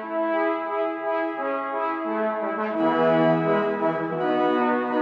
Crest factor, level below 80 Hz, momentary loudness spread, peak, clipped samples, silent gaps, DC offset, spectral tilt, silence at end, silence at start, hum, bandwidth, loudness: 14 dB; -72 dBFS; 6 LU; -8 dBFS; under 0.1%; none; under 0.1%; -8.5 dB/octave; 0 s; 0 s; none; 5.8 kHz; -24 LUFS